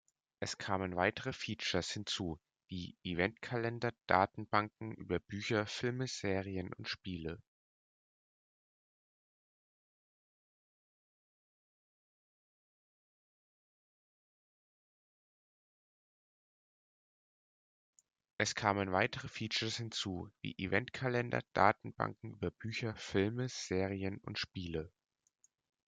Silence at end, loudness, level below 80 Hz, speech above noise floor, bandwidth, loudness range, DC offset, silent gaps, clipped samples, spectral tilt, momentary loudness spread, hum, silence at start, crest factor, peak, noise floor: 1 s; -37 LUFS; -70 dBFS; over 52 dB; 9.4 kHz; 7 LU; under 0.1%; 7.48-17.93 s, 18.33-18.37 s; under 0.1%; -4.5 dB/octave; 11 LU; none; 0.4 s; 28 dB; -12 dBFS; under -90 dBFS